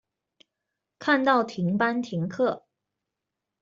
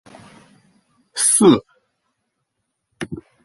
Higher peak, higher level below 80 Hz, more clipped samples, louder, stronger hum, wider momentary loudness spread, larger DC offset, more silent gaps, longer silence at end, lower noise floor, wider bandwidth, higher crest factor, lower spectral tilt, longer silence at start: second, -8 dBFS vs -2 dBFS; second, -72 dBFS vs -56 dBFS; neither; second, -25 LUFS vs -14 LUFS; neither; second, 10 LU vs 20 LU; neither; neither; first, 1.05 s vs 0.3 s; first, -86 dBFS vs -75 dBFS; second, 7.6 kHz vs 12 kHz; about the same, 20 dB vs 20 dB; first, -6.5 dB/octave vs -3.5 dB/octave; second, 1 s vs 1.15 s